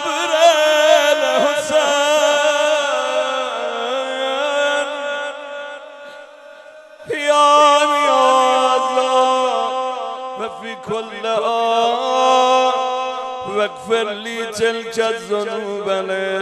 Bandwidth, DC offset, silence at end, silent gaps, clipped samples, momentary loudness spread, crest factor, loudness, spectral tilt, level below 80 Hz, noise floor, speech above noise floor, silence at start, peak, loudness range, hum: 13.5 kHz; under 0.1%; 0 s; none; under 0.1%; 14 LU; 18 dB; -16 LUFS; -1.5 dB/octave; -66 dBFS; -40 dBFS; 20 dB; 0 s; 0 dBFS; 7 LU; none